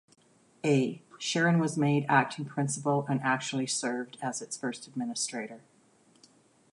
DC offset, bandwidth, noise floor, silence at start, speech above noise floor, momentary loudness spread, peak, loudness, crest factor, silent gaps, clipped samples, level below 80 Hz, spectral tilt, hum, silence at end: under 0.1%; 11.5 kHz; -63 dBFS; 0.65 s; 34 dB; 10 LU; -10 dBFS; -30 LUFS; 22 dB; none; under 0.1%; -78 dBFS; -4.5 dB/octave; none; 1.15 s